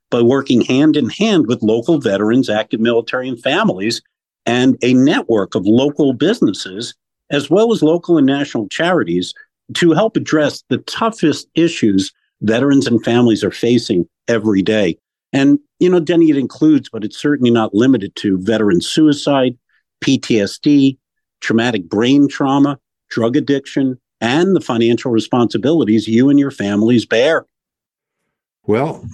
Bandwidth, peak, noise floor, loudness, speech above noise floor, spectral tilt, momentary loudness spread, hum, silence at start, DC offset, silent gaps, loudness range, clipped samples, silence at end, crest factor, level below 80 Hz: 11.5 kHz; -4 dBFS; -85 dBFS; -14 LUFS; 71 dB; -6 dB/octave; 8 LU; none; 0.1 s; under 0.1%; none; 2 LU; under 0.1%; 0 s; 12 dB; -58 dBFS